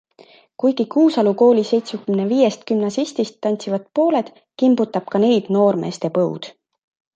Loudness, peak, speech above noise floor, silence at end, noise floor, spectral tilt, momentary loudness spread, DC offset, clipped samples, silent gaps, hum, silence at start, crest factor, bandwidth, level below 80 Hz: -18 LUFS; -2 dBFS; 32 dB; 0.65 s; -49 dBFS; -6.5 dB/octave; 8 LU; under 0.1%; under 0.1%; none; none; 0.2 s; 16 dB; 9 kHz; -70 dBFS